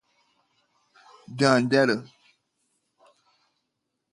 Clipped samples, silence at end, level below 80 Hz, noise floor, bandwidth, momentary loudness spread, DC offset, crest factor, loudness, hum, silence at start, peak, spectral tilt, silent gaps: under 0.1%; 2.1 s; -74 dBFS; -80 dBFS; 11.5 kHz; 12 LU; under 0.1%; 24 dB; -22 LUFS; none; 1.3 s; -4 dBFS; -5.5 dB/octave; none